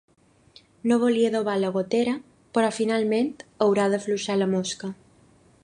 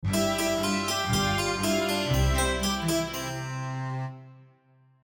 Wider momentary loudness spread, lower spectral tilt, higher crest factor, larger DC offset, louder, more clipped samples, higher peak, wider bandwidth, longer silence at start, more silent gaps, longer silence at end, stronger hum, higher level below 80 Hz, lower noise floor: about the same, 9 LU vs 9 LU; about the same, -5 dB/octave vs -4 dB/octave; about the same, 18 dB vs 16 dB; neither; first, -24 LUFS vs -27 LUFS; neither; first, -8 dBFS vs -12 dBFS; second, 10.5 kHz vs over 20 kHz; first, 0.85 s vs 0 s; neither; about the same, 0.7 s vs 0.6 s; neither; second, -68 dBFS vs -38 dBFS; second, -57 dBFS vs -61 dBFS